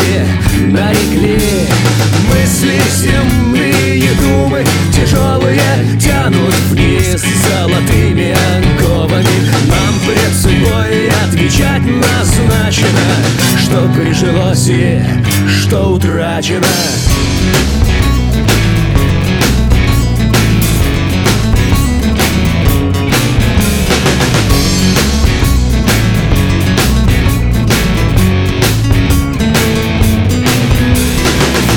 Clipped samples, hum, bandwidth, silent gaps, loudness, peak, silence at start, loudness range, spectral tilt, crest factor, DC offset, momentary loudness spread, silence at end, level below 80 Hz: under 0.1%; none; 19.5 kHz; none; -10 LUFS; 0 dBFS; 0 s; 1 LU; -5 dB/octave; 10 dB; under 0.1%; 2 LU; 0 s; -18 dBFS